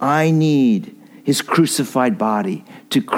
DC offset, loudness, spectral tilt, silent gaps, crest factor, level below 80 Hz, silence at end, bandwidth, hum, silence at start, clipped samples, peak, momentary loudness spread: under 0.1%; -17 LUFS; -5.5 dB/octave; none; 14 dB; -68 dBFS; 0 s; 16.5 kHz; none; 0 s; under 0.1%; -2 dBFS; 11 LU